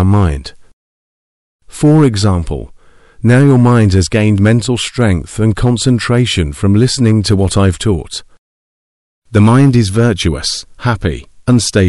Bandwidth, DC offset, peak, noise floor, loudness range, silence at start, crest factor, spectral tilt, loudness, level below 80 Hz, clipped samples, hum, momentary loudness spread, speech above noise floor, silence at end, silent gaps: 12 kHz; under 0.1%; 0 dBFS; -39 dBFS; 3 LU; 0 s; 12 dB; -6 dB/octave; -12 LUFS; -30 dBFS; under 0.1%; none; 10 LU; 29 dB; 0 s; 0.73-1.59 s, 8.38-9.22 s